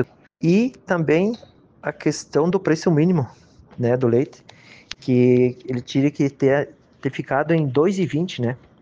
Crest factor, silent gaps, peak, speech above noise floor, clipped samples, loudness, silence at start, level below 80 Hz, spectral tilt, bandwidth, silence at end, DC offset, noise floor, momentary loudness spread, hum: 16 dB; none; -4 dBFS; 21 dB; under 0.1%; -21 LUFS; 0 s; -60 dBFS; -7 dB/octave; 9.2 kHz; 0.25 s; under 0.1%; -41 dBFS; 12 LU; none